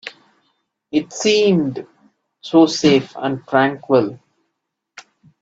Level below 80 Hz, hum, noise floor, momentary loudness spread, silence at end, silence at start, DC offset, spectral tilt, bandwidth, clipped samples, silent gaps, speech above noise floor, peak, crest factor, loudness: -60 dBFS; none; -77 dBFS; 13 LU; 1.25 s; 0.05 s; under 0.1%; -5 dB/octave; 8 kHz; under 0.1%; none; 61 dB; 0 dBFS; 18 dB; -17 LUFS